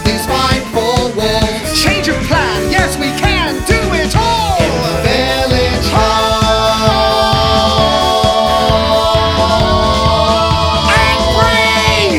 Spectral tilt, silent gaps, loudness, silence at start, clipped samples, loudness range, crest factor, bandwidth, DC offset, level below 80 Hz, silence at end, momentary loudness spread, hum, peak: -4.5 dB/octave; none; -11 LUFS; 0 s; under 0.1%; 2 LU; 12 dB; 19 kHz; under 0.1%; -22 dBFS; 0 s; 4 LU; none; 0 dBFS